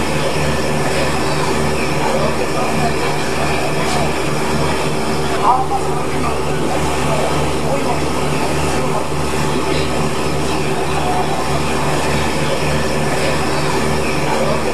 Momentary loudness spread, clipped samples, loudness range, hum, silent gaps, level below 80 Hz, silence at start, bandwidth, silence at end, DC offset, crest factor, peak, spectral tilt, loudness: 2 LU; under 0.1%; 1 LU; none; none; -32 dBFS; 0 s; 14.5 kHz; 0 s; 10%; 16 dB; 0 dBFS; -4.5 dB/octave; -17 LUFS